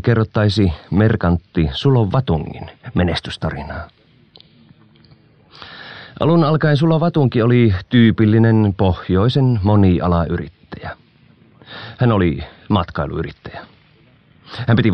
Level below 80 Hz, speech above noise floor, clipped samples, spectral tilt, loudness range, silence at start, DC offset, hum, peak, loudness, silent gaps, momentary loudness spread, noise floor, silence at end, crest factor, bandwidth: -36 dBFS; 36 dB; under 0.1%; -8.5 dB/octave; 10 LU; 0.05 s; under 0.1%; none; 0 dBFS; -16 LUFS; none; 20 LU; -51 dBFS; 0 s; 16 dB; 8.8 kHz